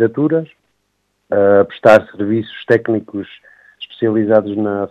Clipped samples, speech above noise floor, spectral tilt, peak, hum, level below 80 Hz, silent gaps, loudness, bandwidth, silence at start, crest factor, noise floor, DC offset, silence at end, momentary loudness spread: 0.2%; 52 dB; -7.5 dB/octave; 0 dBFS; 50 Hz at -45 dBFS; -60 dBFS; none; -15 LUFS; 8.8 kHz; 0 s; 16 dB; -67 dBFS; under 0.1%; 0.05 s; 18 LU